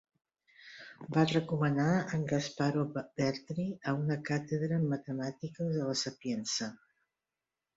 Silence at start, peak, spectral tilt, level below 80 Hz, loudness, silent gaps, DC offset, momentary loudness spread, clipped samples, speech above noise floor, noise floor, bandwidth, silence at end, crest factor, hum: 0.6 s; -16 dBFS; -5.5 dB/octave; -70 dBFS; -33 LUFS; none; under 0.1%; 9 LU; under 0.1%; over 57 dB; under -90 dBFS; 7.8 kHz; 1 s; 18 dB; none